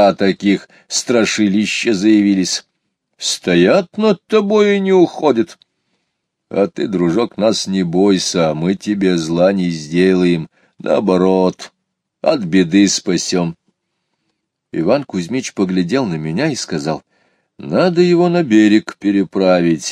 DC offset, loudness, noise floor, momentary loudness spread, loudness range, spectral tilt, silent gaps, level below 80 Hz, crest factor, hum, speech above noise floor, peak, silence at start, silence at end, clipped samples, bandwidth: under 0.1%; -15 LUFS; -72 dBFS; 8 LU; 5 LU; -5 dB/octave; none; -56 dBFS; 14 dB; none; 58 dB; 0 dBFS; 0 s; 0 s; under 0.1%; 13 kHz